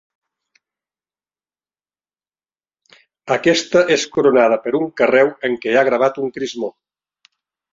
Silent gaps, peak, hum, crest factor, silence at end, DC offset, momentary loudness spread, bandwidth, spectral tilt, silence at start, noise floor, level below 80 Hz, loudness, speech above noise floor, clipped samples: none; -2 dBFS; none; 18 dB; 1 s; under 0.1%; 10 LU; 7.8 kHz; -4 dB/octave; 3.25 s; under -90 dBFS; -62 dBFS; -16 LUFS; over 74 dB; under 0.1%